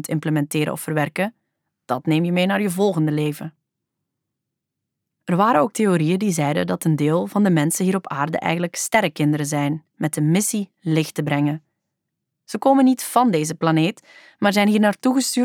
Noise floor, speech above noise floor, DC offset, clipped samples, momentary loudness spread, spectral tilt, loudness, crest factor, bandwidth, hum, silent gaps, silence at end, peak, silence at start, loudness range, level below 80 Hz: -81 dBFS; 62 dB; under 0.1%; under 0.1%; 9 LU; -5.5 dB/octave; -20 LUFS; 18 dB; 18.5 kHz; none; none; 0 s; -4 dBFS; 0 s; 4 LU; -70 dBFS